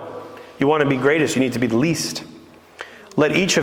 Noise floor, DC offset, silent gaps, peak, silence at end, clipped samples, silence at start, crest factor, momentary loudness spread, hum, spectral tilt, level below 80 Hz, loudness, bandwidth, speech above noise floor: -42 dBFS; under 0.1%; none; -4 dBFS; 0 s; under 0.1%; 0 s; 18 dB; 20 LU; none; -4.5 dB/octave; -54 dBFS; -19 LUFS; 19 kHz; 24 dB